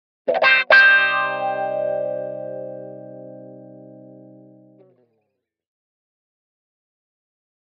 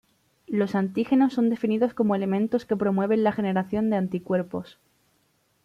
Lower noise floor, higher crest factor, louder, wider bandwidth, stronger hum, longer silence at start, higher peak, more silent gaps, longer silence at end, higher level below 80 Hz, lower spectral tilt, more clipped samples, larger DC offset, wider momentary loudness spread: first, -75 dBFS vs -68 dBFS; first, 22 dB vs 16 dB; first, -16 LUFS vs -25 LUFS; second, 6.2 kHz vs 7.4 kHz; neither; second, 0.25 s vs 0.5 s; first, 0 dBFS vs -10 dBFS; neither; first, 3.75 s vs 1 s; second, -84 dBFS vs -64 dBFS; second, -4 dB/octave vs -8.5 dB/octave; neither; neither; first, 27 LU vs 6 LU